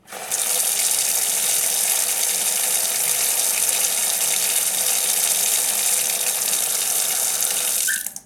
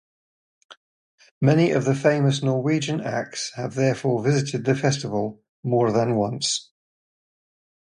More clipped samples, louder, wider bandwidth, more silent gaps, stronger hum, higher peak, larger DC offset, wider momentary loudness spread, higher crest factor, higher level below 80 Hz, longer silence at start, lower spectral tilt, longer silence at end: neither; first, -18 LUFS vs -23 LUFS; first, over 20 kHz vs 11 kHz; second, none vs 0.77-1.18 s, 1.31-1.41 s, 5.49-5.63 s; neither; about the same, -2 dBFS vs -4 dBFS; neither; second, 2 LU vs 9 LU; about the same, 18 dB vs 20 dB; second, -68 dBFS vs -62 dBFS; second, 0.1 s vs 0.7 s; second, 2.5 dB/octave vs -5.5 dB/octave; second, 0.05 s vs 1.3 s